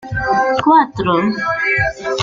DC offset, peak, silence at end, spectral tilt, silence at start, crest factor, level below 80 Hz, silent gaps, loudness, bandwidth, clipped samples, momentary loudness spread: under 0.1%; -2 dBFS; 0 s; -5.5 dB/octave; 0 s; 14 dB; -38 dBFS; none; -15 LUFS; 7.6 kHz; under 0.1%; 6 LU